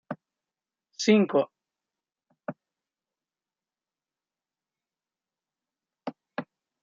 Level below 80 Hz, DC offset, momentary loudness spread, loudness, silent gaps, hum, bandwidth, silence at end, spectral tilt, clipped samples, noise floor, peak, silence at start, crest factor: -84 dBFS; under 0.1%; 20 LU; -25 LUFS; none; none; 7.4 kHz; 0.4 s; -5 dB/octave; under 0.1%; under -90 dBFS; -8 dBFS; 0.1 s; 24 dB